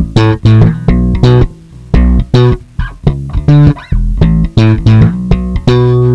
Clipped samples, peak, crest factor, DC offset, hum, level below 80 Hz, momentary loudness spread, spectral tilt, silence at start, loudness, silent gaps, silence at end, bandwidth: 4%; 0 dBFS; 8 dB; under 0.1%; none; -16 dBFS; 8 LU; -8.5 dB/octave; 0 s; -9 LUFS; none; 0 s; 7.6 kHz